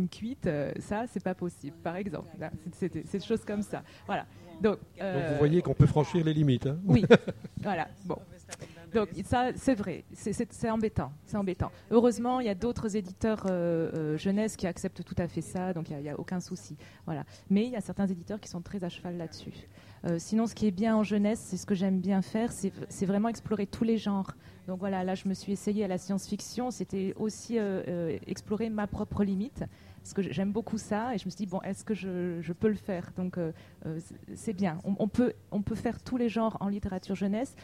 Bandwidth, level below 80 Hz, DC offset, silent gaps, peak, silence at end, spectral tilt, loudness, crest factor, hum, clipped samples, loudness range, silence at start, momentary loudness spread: 14 kHz; -54 dBFS; under 0.1%; none; -6 dBFS; 0 s; -7 dB/octave; -31 LUFS; 26 dB; none; under 0.1%; 7 LU; 0 s; 12 LU